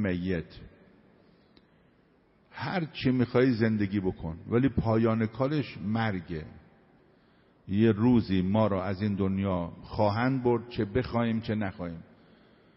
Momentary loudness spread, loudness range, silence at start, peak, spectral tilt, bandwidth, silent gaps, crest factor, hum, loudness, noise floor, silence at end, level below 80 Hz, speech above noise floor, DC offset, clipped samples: 13 LU; 3 LU; 0 s; -12 dBFS; -7 dB/octave; 5.8 kHz; none; 18 dB; none; -28 LUFS; -64 dBFS; 0.75 s; -52 dBFS; 36 dB; under 0.1%; under 0.1%